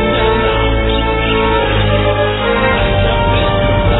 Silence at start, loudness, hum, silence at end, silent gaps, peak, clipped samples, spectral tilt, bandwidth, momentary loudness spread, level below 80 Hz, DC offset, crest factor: 0 s; -13 LUFS; none; 0 s; none; 0 dBFS; under 0.1%; -9.5 dB/octave; 4.1 kHz; 1 LU; -20 dBFS; under 0.1%; 12 dB